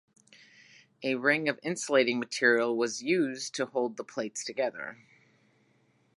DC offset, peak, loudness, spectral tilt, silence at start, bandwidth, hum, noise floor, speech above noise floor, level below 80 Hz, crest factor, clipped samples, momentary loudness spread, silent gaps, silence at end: under 0.1%; -10 dBFS; -29 LUFS; -3.5 dB/octave; 1 s; 11.5 kHz; none; -68 dBFS; 39 dB; -84 dBFS; 22 dB; under 0.1%; 11 LU; none; 1.25 s